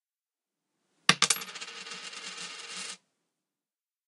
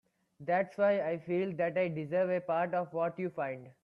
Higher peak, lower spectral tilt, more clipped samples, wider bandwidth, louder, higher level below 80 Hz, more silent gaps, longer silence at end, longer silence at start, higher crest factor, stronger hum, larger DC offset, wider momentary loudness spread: first, -2 dBFS vs -18 dBFS; second, -0.5 dB/octave vs -9 dB/octave; neither; first, 15.5 kHz vs 5.8 kHz; first, -30 LUFS vs -33 LUFS; about the same, -80 dBFS vs -78 dBFS; neither; first, 1.1 s vs 0.1 s; first, 1.1 s vs 0.4 s; first, 34 dB vs 14 dB; neither; neither; first, 16 LU vs 7 LU